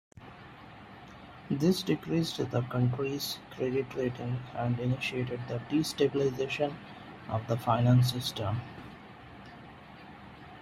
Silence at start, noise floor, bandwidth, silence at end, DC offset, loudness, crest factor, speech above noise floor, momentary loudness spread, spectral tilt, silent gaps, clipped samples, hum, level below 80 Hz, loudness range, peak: 0.2 s; -50 dBFS; 15 kHz; 0 s; under 0.1%; -31 LUFS; 20 dB; 20 dB; 22 LU; -6.5 dB/octave; none; under 0.1%; none; -60 dBFS; 3 LU; -12 dBFS